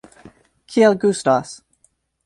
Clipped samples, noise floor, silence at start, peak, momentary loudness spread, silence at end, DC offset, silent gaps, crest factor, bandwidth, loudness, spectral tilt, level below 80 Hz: under 0.1%; -62 dBFS; 0.7 s; -4 dBFS; 21 LU; 0.7 s; under 0.1%; none; 18 dB; 11.5 kHz; -17 LUFS; -5 dB/octave; -62 dBFS